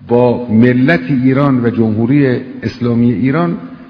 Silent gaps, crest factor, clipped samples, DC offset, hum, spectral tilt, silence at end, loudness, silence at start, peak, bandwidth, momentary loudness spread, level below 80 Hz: none; 12 dB; 0.3%; under 0.1%; none; -10 dB/octave; 0.05 s; -12 LUFS; 0 s; 0 dBFS; 5.4 kHz; 7 LU; -46 dBFS